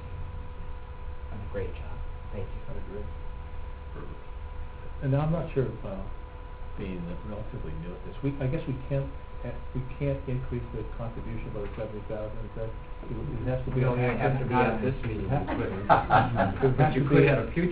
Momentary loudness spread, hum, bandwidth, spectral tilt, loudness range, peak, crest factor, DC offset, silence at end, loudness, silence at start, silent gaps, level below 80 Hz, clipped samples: 18 LU; none; 4 kHz; -11.5 dB/octave; 14 LU; -6 dBFS; 24 dB; under 0.1%; 0 s; -30 LUFS; 0 s; none; -40 dBFS; under 0.1%